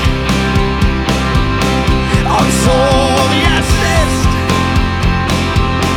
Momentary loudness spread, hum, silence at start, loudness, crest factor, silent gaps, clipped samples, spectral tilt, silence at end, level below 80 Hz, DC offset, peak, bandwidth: 3 LU; none; 0 s; -12 LUFS; 12 dB; none; under 0.1%; -5 dB/octave; 0 s; -18 dBFS; under 0.1%; 0 dBFS; 17.5 kHz